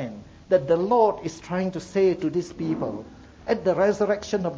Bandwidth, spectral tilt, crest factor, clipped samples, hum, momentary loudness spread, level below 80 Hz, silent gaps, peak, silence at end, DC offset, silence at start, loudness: 8 kHz; -6.5 dB/octave; 16 dB; under 0.1%; none; 13 LU; -54 dBFS; none; -8 dBFS; 0 s; under 0.1%; 0 s; -24 LUFS